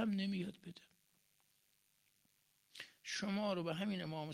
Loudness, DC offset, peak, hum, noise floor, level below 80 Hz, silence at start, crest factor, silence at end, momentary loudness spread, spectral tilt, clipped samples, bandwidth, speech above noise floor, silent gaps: -41 LUFS; under 0.1%; -28 dBFS; none; -78 dBFS; -82 dBFS; 0 s; 16 dB; 0 s; 18 LU; -5.5 dB/octave; under 0.1%; 15 kHz; 37 dB; none